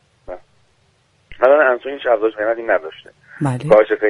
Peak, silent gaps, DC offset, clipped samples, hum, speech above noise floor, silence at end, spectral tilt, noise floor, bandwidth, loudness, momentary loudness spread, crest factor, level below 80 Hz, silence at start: 0 dBFS; none; under 0.1%; under 0.1%; none; 43 dB; 0 s; -7 dB/octave; -59 dBFS; 11 kHz; -16 LUFS; 23 LU; 18 dB; -52 dBFS; 0.3 s